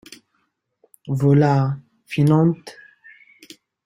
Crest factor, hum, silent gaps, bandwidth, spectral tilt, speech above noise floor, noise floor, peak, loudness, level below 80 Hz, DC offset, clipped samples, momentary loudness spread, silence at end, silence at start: 18 dB; none; none; 12 kHz; -8.5 dB/octave; 53 dB; -70 dBFS; -4 dBFS; -18 LUFS; -58 dBFS; under 0.1%; under 0.1%; 18 LU; 1.15 s; 1.05 s